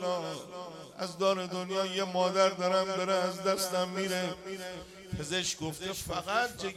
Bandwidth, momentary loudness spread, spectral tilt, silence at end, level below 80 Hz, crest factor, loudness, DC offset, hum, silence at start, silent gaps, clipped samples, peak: 16 kHz; 13 LU; -3.5 dB/octave; 0 s; -60 dBFS; 20 dB; -32 LUFS; under 0.1%; none; 0 s; none; under 0.1%; -12 dBFS